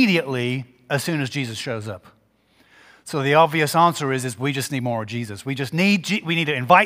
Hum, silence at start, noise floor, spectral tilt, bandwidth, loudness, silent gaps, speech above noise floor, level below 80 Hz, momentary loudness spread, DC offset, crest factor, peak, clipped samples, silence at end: none; 0 s; -60 dBFS; -5 dB/octave; 16 kHz; -21 LUFS; none; 39 dB; -66 dBFS; 13 LU; under 0.1%; 20 dB; 0 dBFS; under 0.1%; 0 s